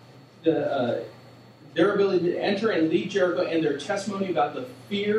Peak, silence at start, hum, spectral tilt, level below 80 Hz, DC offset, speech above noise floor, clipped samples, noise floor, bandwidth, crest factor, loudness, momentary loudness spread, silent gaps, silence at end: -8 dBFS; 0.15 s; none; -6 dB/octave; -74 dBFS; under 0.1%; 25 dB; under 0.1%; -49 dBFS; 11.5 kHz; 18 dB; -25 LUFS; 8 LU; none; 0 s